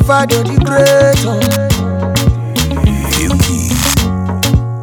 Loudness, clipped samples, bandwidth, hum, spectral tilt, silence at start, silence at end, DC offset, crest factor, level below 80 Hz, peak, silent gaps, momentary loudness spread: -12 LUFS; under 0.1%; over 20 kHz; none; -5 dB/octave; 0 s; 0 s; under 0.1%; 12 dB; -22 dBFS; 0 dBFS; none; 6 LU